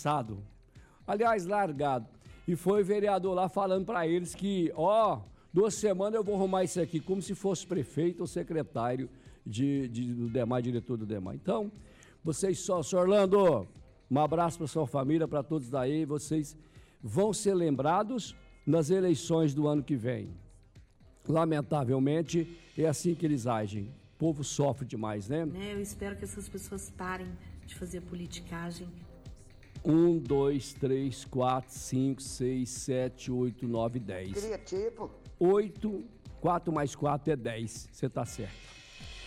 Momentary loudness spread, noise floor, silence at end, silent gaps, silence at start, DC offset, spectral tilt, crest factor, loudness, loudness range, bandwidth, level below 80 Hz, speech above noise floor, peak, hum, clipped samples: 14 LU; -57 dBFS; 0 s; none; 0 s; under 0.1%; -6.5 dB/octave; 14 dB; -31 LUFS; 5 LU; 15.5 kHz; -56 dBFS; 27 dB; -18 dBFS; none; under 0.1%